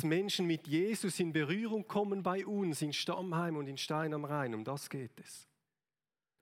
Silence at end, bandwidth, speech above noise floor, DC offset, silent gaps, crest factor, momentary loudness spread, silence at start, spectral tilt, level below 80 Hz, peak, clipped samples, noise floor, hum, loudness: 1 s; 16.5 kHz; over 54 dB; under 0.1%; none; 16 dB; 10 LU; 0 s; -5 dB/octave; -84 dBFS; -20 dBFS; under 0.1%; under -90 dBFS; none; -36 LUFS